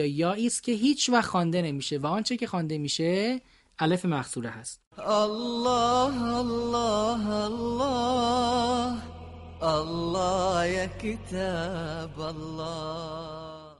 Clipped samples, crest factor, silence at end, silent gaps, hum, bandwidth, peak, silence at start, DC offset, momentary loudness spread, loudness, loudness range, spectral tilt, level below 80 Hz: under 0.1%; 20 dB; 0.05 s; 4.87-4.91 s; none; 11.5 kHz; -8 dBFS; 0 s; under 0.1%; 11 LU; -28 LUFS; 3 LU; -4.5 dB/octave; -50 dBFS